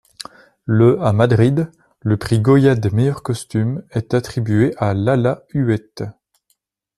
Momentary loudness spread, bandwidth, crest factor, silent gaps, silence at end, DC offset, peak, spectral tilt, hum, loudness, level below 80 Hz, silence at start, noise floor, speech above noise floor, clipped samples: 17 LU; 12.5 kHz; 16 dB; none; 0.85 s; under 0.1%; -2 dBFS; -8 dB/octave; none; -17 LUFS; -48 dBFS; 0.2 s; -67 dBFS; 51 dB; under 0.1%